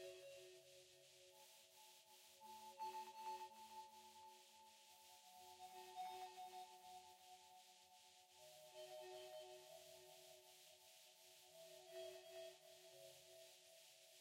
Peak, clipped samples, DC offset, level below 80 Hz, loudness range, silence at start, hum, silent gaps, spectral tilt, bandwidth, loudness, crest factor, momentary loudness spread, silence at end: -44 dBFS; under 0.1%; under 0.1%; under -90 dBFS; 3 LU; 0 s; none; none; -1.5 dB/octave; 16 kHz; -60 LUFS; 18 dB; 12 LU; 0 s